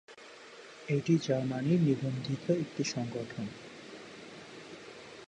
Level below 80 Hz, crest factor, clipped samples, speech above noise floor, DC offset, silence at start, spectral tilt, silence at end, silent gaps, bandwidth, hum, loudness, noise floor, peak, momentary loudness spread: -70 dBFS; 18 dB; under 0.1%; 20 dB; under 0.1%; 0.1 s; -6.5 dB/octave; 0.05 s; none; 9.8 kHz; none; -32 LUFS; -52 dBFS; -16 dBFS; 20 LU